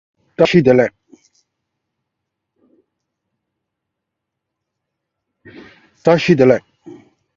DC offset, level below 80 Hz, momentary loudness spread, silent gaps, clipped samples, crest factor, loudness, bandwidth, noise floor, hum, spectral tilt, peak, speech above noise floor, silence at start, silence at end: under 0.1%; -56 dBFS; 9 LU; none; under 0.1%; 20 dB; -14 LUFS; 7.4 kHz; -79 dBFS; none; -7 dB/octave; 0 dBFS; 67 dB; 0.4 s; 0.45 s